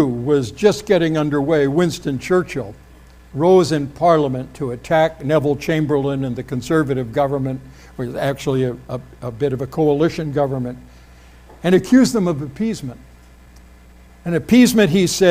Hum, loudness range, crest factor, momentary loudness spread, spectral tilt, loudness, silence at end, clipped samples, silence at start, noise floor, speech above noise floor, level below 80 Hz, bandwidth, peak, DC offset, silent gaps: none; 4 LU; 16 dB; 15 LU; -6 dB/octave; -18 LUFS; 0 s; under 0.1%; 0 s; -44 dBFS; 27 dB; -44 dBFS; 16 kHz; -2 dBFS; under 0.1%; none